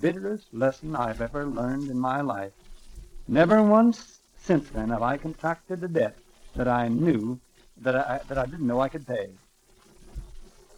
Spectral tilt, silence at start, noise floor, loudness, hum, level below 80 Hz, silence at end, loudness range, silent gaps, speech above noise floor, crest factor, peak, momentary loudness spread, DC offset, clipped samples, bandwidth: -7.5 dB/octave; 0 s; -58 dBFS; -26 LUFS; none; -46 dBFS; 0.35 s; 6 LU; none; 33 dB; 22 dB; -6 dBFS; 19 LU; under 0.1%; under 0.1%; 11.5 kHz